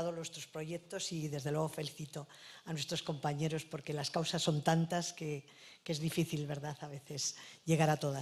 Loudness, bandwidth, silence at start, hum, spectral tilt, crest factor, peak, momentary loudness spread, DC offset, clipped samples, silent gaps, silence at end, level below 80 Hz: -37 LUFS; 14.5 kHz; 0 s; none; -4.5 dB/octave; 22 dB; -16 dBFS; 14 LU; under 0.1%; under 0.1%; none; 0 s; -72 dBFS